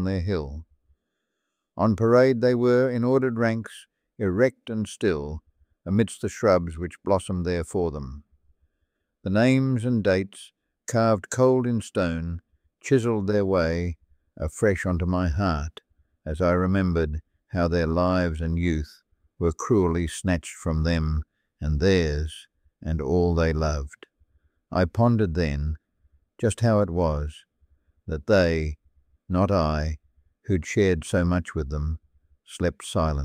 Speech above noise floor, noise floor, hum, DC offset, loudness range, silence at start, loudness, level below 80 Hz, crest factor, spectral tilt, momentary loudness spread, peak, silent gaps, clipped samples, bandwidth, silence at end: 57 dB; -81 dBFS; none; under 0.1%; 4 LU; 0 s; -24 LUFS; -38 dBFS; 18 dB; -7 dB/octave; 16 LU; -6 dBFS; none; under 0.1%; 14 kHz; 0 s